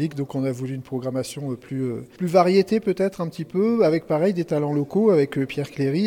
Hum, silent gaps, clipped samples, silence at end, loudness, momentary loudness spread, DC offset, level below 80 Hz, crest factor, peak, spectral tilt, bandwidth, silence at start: none; none; under 0.1%; 0 s; -23 LUFS; 11 LU; under 0.1%; -62 dBFS; 18 dB; -4 dBFS; -7.5 dB/octave; 17 kHz; 0 s